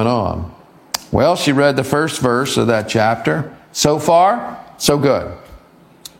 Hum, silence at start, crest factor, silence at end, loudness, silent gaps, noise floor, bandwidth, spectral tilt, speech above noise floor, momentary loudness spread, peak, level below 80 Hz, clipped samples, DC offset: none; 0 s; 16 dB; 0.6 s; -16 LUFS; none; -45 dBFS; 17 kHz; -4.5 dB/octave; 30 dB; 13 LU; 0 dBFS; -42 dBFS; under 0.1%; under 0.1%